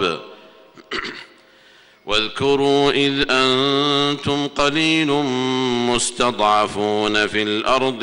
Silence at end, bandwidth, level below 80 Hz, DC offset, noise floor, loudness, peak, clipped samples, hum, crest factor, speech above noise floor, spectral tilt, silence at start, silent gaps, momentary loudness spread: 0 s; 11 kHz; -48 dBFS; under 0.1%; -50 dBFS; -18 LUFS; -4 dBFS; under 0.1%; none; 14 dB; 32 dB; -3.5 dB/octave; 0 s; none; 11 LU